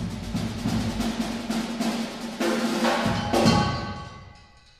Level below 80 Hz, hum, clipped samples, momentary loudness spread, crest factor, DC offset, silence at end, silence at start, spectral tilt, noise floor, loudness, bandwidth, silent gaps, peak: -42 dBFS; none; under 0.1%; 11 LU; 20 dB; under 0.1%; 0.35 s; 0 s; -5 dB/octave; -51 dBFS; -26 LUFS; 15.5 kHz; none; -6 dBFS